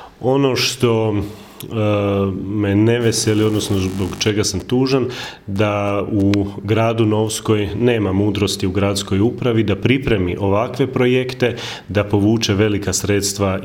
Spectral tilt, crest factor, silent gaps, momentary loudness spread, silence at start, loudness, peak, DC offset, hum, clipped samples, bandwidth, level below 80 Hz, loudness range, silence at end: -5.5 dB/octave; 18 dB; none; 5 LU; 0 s; -17 LUFS; 0 dBFS; under 0.1%; none; under 0.1%; 17 kHz; -44 dBFS; 1 LU; 0 s